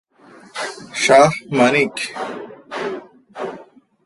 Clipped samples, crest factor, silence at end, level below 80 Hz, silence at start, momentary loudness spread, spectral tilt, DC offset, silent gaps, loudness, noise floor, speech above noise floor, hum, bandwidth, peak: under 0.1%; 20 dB; 0.4 s; -60 dBFS; 0.55 s; 19 LU; -4 dB/octave; under 0.1%; none; -17 LUFS; -46 dBFS; 31 dB; none; 11.5 kHz; 0 dBFS